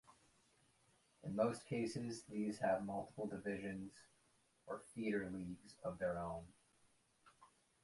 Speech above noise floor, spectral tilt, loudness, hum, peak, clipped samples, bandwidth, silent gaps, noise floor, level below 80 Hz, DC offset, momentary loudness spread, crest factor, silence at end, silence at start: 33 dB; -6 dB/octave; -44 LUFS; none; -24 dBFS; under 0.1%; 11.5 kHz; none; -77 dBFS; -72 dBFS; under 0.1%; 12 LU; 22 dB; 0.35 s; 0.1 s